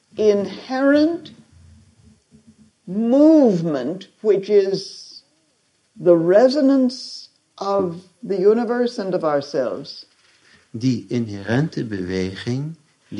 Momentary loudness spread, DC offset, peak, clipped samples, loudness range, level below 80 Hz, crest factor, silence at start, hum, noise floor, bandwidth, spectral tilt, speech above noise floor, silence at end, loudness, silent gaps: 18 LU; under 0.1%; -2 dBFS; under 0.1%; 6 LU; -56 dBFS; 18 dB; 0.15 s; none; -64 dBFS; 10.5 kHz; -7 dB/octave; 46 dB; 0 s; -19 LUFS; none